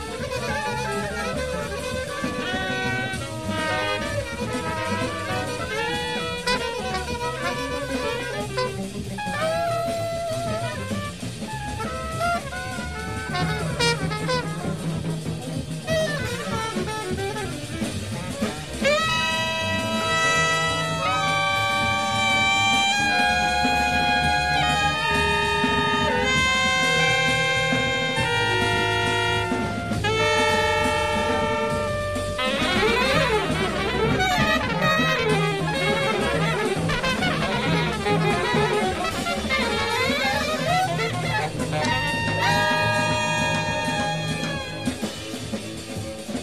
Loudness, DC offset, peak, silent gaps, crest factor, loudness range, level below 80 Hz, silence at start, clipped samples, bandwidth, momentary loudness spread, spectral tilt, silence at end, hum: -23 LUFS; 0.3%; -8 dBFS; none; 16 dB; 7 LU; -42 dBFS; 0 s; under 0.1%; 15 kHz; 9 LU; -4 dB/octave; 0 s; none